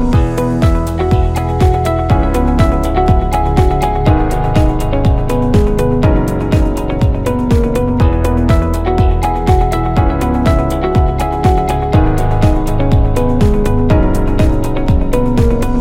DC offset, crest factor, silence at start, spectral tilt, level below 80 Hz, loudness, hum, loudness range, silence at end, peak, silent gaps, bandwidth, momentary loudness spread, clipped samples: under 0.1%; 12 dB; 0 s; -8 dB/octave; -14 dBFS; -13 LUFS; none; 1 LU; 0 s; 0 dBFS; none; 16.5 kHz; 2 LU; under 0.1%